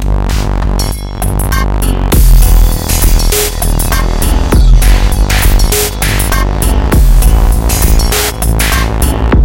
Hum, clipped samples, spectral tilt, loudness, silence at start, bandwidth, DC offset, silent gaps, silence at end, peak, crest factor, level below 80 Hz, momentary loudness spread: none; 1%; -4.5 dB/octave; -11 LUFS; 0 s; 17.5 kHz; under 0.1%; none; 0 s; 0 dBFS; 8 dB; -8 dBFS; 5 LU